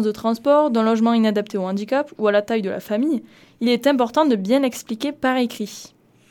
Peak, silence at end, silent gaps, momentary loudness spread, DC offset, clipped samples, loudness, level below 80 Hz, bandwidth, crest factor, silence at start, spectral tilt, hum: -4 dBFS; 0.45 s; none; 9 LU; under 0.1%; under 0.1%; -20 LUFS; -64 dBFS; 18 kHz; 16 dB; 0 s; -5.5 dB/octave; none